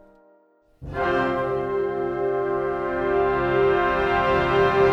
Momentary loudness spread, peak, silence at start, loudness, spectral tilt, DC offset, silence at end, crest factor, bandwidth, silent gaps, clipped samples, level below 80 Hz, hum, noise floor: 6 LU; -8 dBFS; 0.8 s; -22 LUFS; -7 dB/octave; under 0.1%; 0 s; 14 dB; 6.6 kHz; none; under 0.1%; -44 dBFS; none; -59 dBFS